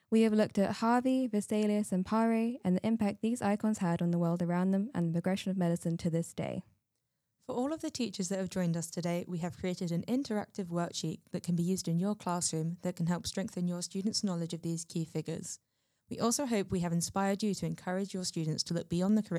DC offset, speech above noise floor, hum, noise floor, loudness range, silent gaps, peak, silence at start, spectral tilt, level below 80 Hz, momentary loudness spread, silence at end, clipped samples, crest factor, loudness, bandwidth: under 0.1%; 50 dB; none; -83 dBFS; 5 LU; none; -14 dBFS; 0.1 s; -5.5 dB/octave; -68 dBFS; 8 LU; 0 s; under 0.1%; 18 dB; -33 LUFS; 14 kHz